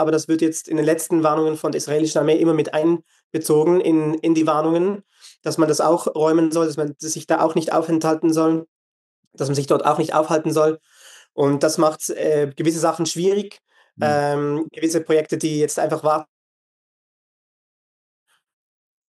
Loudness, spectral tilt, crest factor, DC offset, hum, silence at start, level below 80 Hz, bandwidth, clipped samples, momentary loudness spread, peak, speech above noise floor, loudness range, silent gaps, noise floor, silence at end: -20 LUFS; -5.5 dB/octave; 16 dB; under 0.1%; none; 0 s; -78 dBFS; 12.5 kHz; under 0.1%; 7 LU; -4 dBFS; over 71 dB; 4 LU; 3.24-3.30 s, 8.68-9.31 s; under -90 dBFS; 2.85 s